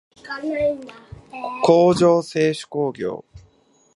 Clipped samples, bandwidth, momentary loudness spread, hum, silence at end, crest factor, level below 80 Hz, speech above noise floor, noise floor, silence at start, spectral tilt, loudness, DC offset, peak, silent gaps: under 0.1%; 11.5 kHz; 19 LU; none; 0.55 s; 20 dB; -54 dBFS; 39 dB; -58 dBFS; 0.25 s; -6 dB/octave; -19 LUFS; under 0.1%; -2 dBFS; none